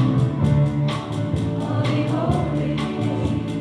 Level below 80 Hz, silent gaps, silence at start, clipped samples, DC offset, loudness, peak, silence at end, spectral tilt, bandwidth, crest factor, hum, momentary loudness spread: -40 dBFS; none; 0 s; under 0.1%; under 0.1%; -22 LUFS; -8 dBFS; 0 s; -8 dB/octave; 10.5 kHz; 14 dB; none; 5 LU